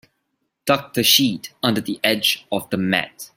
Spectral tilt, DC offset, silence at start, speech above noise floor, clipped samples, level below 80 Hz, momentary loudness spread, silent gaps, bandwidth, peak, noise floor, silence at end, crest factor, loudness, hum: -3 dB/octave; under 0.1%; 0.65 s; 53 dB; under 0.1%; -62 dBFS; 9 LU; none; 16.5 kHz; -2 dBFS; -74 dBFS; 0.1 s; 20 dB; -19 LUFS; none